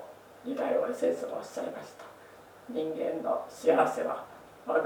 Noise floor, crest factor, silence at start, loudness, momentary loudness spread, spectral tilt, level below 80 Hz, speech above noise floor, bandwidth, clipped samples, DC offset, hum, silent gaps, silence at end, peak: -52 dBFS; 22 dB; 0 s; -31 LUFS; 23 LU; -5 dB/octave; -76 dBFS; 22 dB; 19.5 kHz; under 0.1%; under 0.1%; none; none; 0 s; -10 dBFS